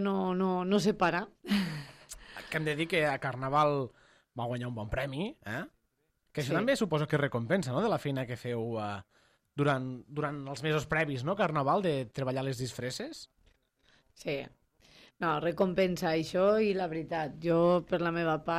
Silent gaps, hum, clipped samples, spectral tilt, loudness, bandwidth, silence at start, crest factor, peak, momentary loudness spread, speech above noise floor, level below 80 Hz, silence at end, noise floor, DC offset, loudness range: none; none; under 0.1%; -6 dB/octave; -31 LUFS; 15.5 kHz; 0 s; 16 dB; -14 dBFS; 12 LU; 46 dB; -60 dBFS; 0 s; -77 dBFS; under 0.1%; 5 LU